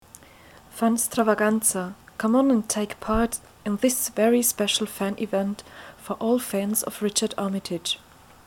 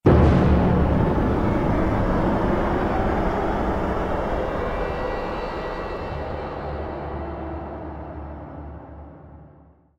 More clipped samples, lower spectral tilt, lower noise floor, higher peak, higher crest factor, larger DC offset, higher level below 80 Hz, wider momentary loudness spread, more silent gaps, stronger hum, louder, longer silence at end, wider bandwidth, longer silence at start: neither; second, -3.5 dB/octave vs -9 dB/octave; about the same, -50 dBFS vs -52 dBFS; about the same, -8 dBFS vs -6 dBFS; about the same, 18 dB vs 18 dB; neither; second, -48 dBFS vs -30 dBFS; second, 11 LU vs 17 LU; neither; neither; about the same, -24 LUFS vs -23 LUFS; about the same, 0.5 s vs 0.5 s; first, 19 kHz vs 7.6 kHz; first, 0.75 s vs 0.05 s